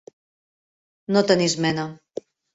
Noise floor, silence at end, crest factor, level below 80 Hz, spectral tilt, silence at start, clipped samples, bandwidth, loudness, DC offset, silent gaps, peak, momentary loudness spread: under -90 dBFS; 0.6 s; 22 dB; -62 dBFS; -4.5 dB/octave; 1.1 s; under 0.1%; 8 kHz; -21 LUFS; under 0.1%; none; -4 dBFS; 19 LU